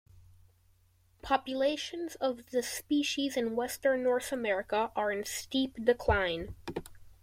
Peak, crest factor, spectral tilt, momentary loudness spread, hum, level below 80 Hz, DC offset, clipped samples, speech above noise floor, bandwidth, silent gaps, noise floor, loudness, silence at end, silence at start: -12 dBFS; 20 dB; -4 dB/octave; 9 LU; none; -52 dBFS; under 0.1%; under 0.1%; 35 dB; 16.5 kHz; none; -67 dBFS; -32 LUFS; 0.1 s; 0.15 s